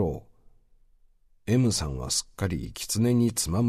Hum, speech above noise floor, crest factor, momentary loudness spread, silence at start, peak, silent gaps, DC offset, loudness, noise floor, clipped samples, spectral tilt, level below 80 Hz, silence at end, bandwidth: none; 35 dB; 16 dB; 9 LU; 0 s; -12 dBFS; none; under 0.1%; -26 LUFS; -60 dBFS; under 0.1%; -5 dB/octave; -44 dBFS; 0 s; 14 kHz